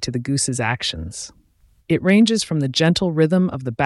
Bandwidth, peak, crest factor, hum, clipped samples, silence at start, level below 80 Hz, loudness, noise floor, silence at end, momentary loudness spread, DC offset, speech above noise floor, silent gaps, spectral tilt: 12 kHz; -4 dBFS; 16 dB; none; under 0.1%; 0 s; -48 dBFS; -19 LUFS; -56 dBFS; 0 s; 14 LU; under 0.1%; 38 dB; none; -5 dB/octave